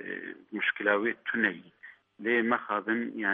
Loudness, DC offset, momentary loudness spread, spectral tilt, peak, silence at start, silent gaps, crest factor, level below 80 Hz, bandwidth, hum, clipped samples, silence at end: -29 LUFS; under 0.1%; 12 LU; -7.5 dB/octave; -10 dBFS; 0 s; none; 20 dB; -82 dBFS; 4 kHz; none; under 0.1%; 0 s